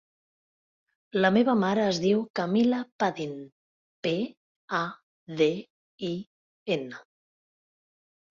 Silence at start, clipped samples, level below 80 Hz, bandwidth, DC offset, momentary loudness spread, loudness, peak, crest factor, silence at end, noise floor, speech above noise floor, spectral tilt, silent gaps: 1.15 s; under 0.1%; -70 dBFS; 7.4 kHz; under 0.1%; 15 LU; -27 LUFS; -8 dBFS; 20 dB; 1.35 s; under -90 dBFS; over 64 dB; -6 dB/octave; 2.30-2.34 s, 2.92-2.99 s, 3.52-4.03 s, 4.37-4.68 s, 5.03-5.27 s, 5.70-5.98 s, 6.27-6.66 s